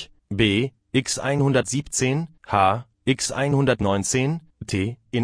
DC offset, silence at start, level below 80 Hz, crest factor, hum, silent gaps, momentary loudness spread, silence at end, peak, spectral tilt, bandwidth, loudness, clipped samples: under 0.1%; 0 s; -48 dBFS; 18 dB; none; none; 6 LU; 0 s; -4 dBFS; -4.5 dB/octave; 11 kHz; -23 LUFS; under 0.1%